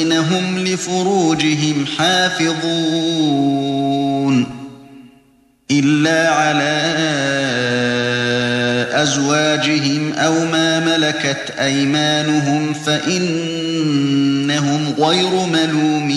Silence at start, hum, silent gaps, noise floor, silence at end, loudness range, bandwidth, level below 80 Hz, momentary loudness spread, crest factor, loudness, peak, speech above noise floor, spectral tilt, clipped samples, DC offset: 0 s; none; none; -54 dBFS; 0 s; 2 LU; 12 kHz; -56 dBFS; 4 LU; 14 dB; -16 LUFS; -2 dBFS; 38 dB; -4 dB/octave; under 0.1%; under 0.1%